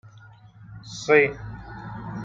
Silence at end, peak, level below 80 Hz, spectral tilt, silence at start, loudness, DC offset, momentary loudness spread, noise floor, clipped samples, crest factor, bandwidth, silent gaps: 0 s; -4 dBFS; -52 dBFS; -5 dB/octave; 0.05 s; -21 LUFS; under 0.1%; 20 LU; -49 dBFS; under 0.1%; 22 dB; 7.8 kHz; none